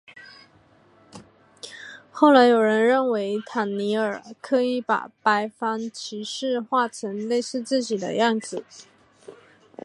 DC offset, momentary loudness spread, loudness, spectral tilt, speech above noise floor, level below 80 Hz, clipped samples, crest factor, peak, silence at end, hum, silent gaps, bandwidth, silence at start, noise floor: under 0.1%; 18 LU; -23 LUFS; -4.5 dB/octave; 34 dB; -76 dBFS; under 0.1%; 22 dB; -2 dBFS; 0.55 s; none; none; 11.5 kHz; 0.15 s; -57 dBFS